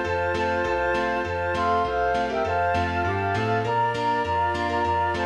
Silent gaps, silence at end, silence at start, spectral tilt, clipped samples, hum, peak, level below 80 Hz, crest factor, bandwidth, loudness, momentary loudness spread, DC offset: none; 0 s; 0 s; -6 dB/octave; under 0.1%; none; -12 dBFS; -44 dBFS; 12 dB; 11.5 kHz; -24 LUFS; 2 LU; under 0.1%